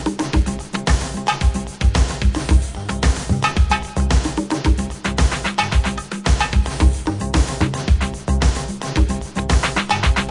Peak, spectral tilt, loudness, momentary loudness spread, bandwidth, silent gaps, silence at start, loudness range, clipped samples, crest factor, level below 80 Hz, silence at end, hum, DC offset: -2 dBFS; -5 dB/octave; -19 LUFS; 4 LU; 11 kHz; none; 0 s; 1 LU; under 0.1%; 16 dB; -20 dBFS; 0 s; none; under 0.1%